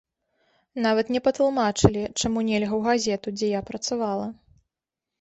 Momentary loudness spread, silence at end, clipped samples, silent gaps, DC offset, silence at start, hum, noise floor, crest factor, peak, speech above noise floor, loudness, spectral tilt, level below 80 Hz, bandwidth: 7 LU; 0.9 s; under 0.1%; none; under 0.1%; 0.75 s; none; -88 dBFS; 22 dB; -2 dBFS; 64 dB; -24 LUFS; -5 dB/octave; -48 dBFS; 8.4 kHz